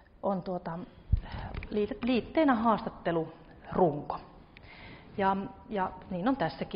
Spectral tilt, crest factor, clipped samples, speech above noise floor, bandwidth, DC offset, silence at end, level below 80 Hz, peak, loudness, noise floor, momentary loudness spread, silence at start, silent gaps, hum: -5.5 dB/octave; 18 dB; under 0.1%; 22 dB; 5.4 kHz; under 0.1%; 0 s; -44 dBFS; -14 dBFS; -32 LUFS; -52 dBFS; 16 LU; 0.25 s; none; none